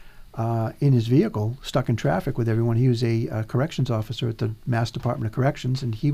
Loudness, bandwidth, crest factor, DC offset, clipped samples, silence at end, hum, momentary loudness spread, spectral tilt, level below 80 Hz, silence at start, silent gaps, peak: -24 LUFS; 13.5 kHz; 16 dB; under 0.1%; under 0.1%; 0 s; none; 6 LU; -7.5 dB/octave; -46 dBFS; 0 s; none; -8 dBFS